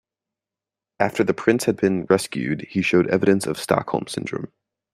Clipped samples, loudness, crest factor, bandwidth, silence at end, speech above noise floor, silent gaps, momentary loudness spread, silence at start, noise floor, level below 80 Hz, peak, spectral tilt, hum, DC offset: under 0.1%; -21 LUFS; 20 dB; 15.5 kHz; 0.45 s; 68 dB; none; 10 LU; 1 s; -89 dBFS; -60 dBFS; -2 dBFS; -5.5 dB/octave; none; under 0.1%